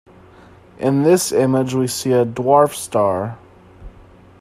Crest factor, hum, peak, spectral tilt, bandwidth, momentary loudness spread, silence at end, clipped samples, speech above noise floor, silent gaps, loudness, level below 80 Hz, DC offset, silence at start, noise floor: 18 dB; none; 0 dBFS; -5.5 dB/octave; 15.5 kHz; 6 LU; 0.5 s; under 0.1%; 29 dB; none; -17 LUFS; -50 dBFS; under 0.1%; 0.8 s; -45 dBFS